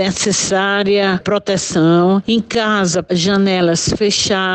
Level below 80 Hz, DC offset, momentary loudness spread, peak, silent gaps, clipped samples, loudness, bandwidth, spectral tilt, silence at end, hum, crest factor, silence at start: -42 dBFS; under 0.1%; 3 LU; -4 dBFS; none; under 0.1%; -14 LUFS; 9.2 kHz; -4 dB/octave; 0 s; none; 10 dB; 0 s